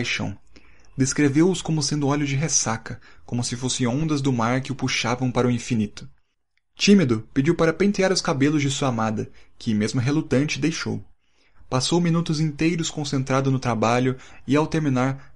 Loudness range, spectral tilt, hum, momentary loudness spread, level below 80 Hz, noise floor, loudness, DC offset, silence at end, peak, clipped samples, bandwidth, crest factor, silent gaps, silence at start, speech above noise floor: 3 LU; -5 dB/octave; none; 9 LU; -50 dBFS; -73 dBFS; -22 LUFS; 0.8%; 0.15 s; -4 dBFS; under 0.1%; 11.5 kHz; 18 dB; none; 0 s; 51 dB